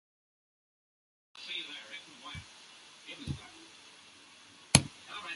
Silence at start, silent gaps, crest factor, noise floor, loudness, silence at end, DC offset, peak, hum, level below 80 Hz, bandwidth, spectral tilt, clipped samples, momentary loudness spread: 1.35 s; none; 36 dB; -57 dBFS; -33 LUFS; 0 s; under 0.1%; -2 dBFS; none; -56 dBFS; 11.5 kHz; -3 dB/octave; under 0.1%; 27 LU